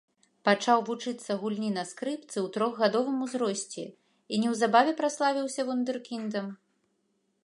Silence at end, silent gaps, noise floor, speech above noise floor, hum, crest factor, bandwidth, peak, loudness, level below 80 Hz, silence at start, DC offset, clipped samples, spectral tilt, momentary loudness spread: 0.9 s; none; -75 dBFS; 46 dB; none; 22 dB; 11.5 kHz; -8 dBFS; -29 LUFS; -82 dBFS; 0.45 s; under 0.1%; under 0.1%; -4 dB/octave; 11 LU